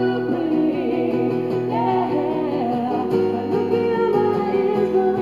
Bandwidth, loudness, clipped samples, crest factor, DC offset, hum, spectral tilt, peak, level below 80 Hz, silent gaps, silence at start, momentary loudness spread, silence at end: 7 kHz; -20 LUFS; under 0.1%; 14 dB; 0.2%; none; -8.5 dB/octave; -6 dBFS; -60 dBFS; none; 0 s; 3 LU; 0 s